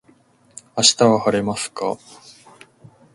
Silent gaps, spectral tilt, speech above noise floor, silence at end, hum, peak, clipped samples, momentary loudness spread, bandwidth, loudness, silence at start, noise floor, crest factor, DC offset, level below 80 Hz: none; -3 dB/octave; 37 dB; 1.2 s; none; 0 dBFS; under 0.1%; 15 LU; 11.5 kHz; -18 LUFS; 0.75 s; -55 dBFS; 22 dB; under 0.1%; -58 dBFS